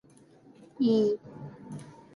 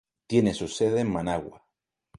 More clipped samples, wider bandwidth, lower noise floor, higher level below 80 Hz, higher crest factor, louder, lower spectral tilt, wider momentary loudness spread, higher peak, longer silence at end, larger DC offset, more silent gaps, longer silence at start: neither; about the same, 11 kHz vs 11.5 kHz; second, -57 dBFS vs -81 dBFS; second, -72 dBFS vs -54 dBFS; about the same, 16 dB vs 20 dB; about the same, -27 LUFS vs -26 LUFS; first, -8 dB/octave vs -6 dB/octave; first, 20 LU vs 8 LU; second, -16 dBFS vs -8 dBFS; second, 0.25 s vs 0.6 s; neither; neither; first, 0.8 s vs 0.3 s